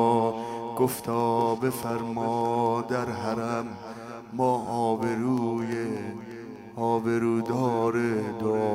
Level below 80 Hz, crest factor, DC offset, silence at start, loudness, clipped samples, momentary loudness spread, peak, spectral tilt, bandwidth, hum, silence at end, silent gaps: -66 dBFS; 18 dB; under 0.1%; 0 s; -27 LUFS; under 0.1%; 12 LU; -10 dBFS; -6.5 dB/octave; 16 kHz; none; 0 s; none